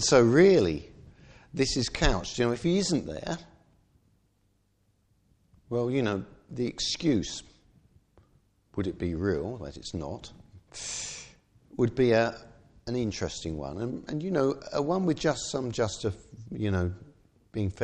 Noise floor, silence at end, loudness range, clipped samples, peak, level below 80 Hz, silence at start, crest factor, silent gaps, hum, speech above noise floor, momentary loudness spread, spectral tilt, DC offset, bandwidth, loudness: -70 dBFS; 0 s; 6 LU; under 0.1%; -8 dBFS; -46 dBFS; 0 s; 20 dB; none; none; 43 dB; 16 LU; -5 dB/octave; under 0.1%; 10 kHz; -29 LUFS